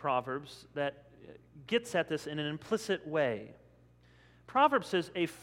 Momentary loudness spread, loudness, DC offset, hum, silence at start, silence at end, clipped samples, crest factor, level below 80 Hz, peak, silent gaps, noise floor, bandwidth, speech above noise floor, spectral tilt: 14 LU; -33 LUFS; under 0.1%; 60 Hz at -60 dBFS; 0 s; 0 s; under 0.1%; 22 dB; -70 dBFS; -12 dBFS; none; -62 dBFS; 16 kHz; 29 dB; -5 dB/octave